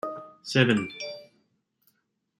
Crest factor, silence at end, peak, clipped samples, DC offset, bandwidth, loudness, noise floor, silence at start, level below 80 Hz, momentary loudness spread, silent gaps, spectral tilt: 24 dB; 1.15 s; -6 dBFS; under 0.1%; under 0.1%; 12.5 kHz; -26 LUFS; -75 dBFS; 0.05 s; -68 dBFS; 18 LU; none; -5.5 dB/octave